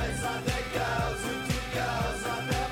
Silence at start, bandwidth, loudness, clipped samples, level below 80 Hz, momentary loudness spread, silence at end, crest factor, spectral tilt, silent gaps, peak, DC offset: 0 s; 17.5 kHz; -31 LUFS; under 0.1%; -40 dBFS; 2 LU; 0 s; 16 dB; -4.5 dB/octave; none; -16 dBFS; under 0.1%